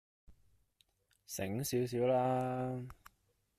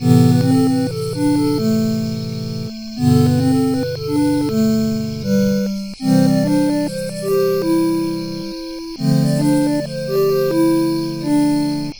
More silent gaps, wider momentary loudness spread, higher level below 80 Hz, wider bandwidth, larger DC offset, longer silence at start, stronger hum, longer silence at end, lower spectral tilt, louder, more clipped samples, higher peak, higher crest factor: neither; first, 13 LU vs 10 LU; second, -68 dBFS vs -46 dBFS; second, 15.5 kHz vs over 20 kHz; second, under 0.1% vs 0.4%; first, 0.3 s vs 0 s; neither; first, 0.65 s vs 0 s; about the same, -6 dB/octave vs -7 dB/octave; second, -36 LUFS vs -17 LUFS; neither; second, -22 dBFS vs 0 dBFS; about the same, 16 dB vs 16 dB